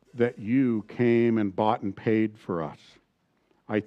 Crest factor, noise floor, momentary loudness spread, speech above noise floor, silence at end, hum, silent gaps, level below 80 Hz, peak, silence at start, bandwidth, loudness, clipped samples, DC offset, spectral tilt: 18 dB; -70 dBFS; 10 LU; 45 dB; 0 s; none; none; -72 dBFS; -8 dBFS; 0.15 s; 6.2 kHz; -26 LUFS; under 0.1%; under 0.1%; -9 dB/octave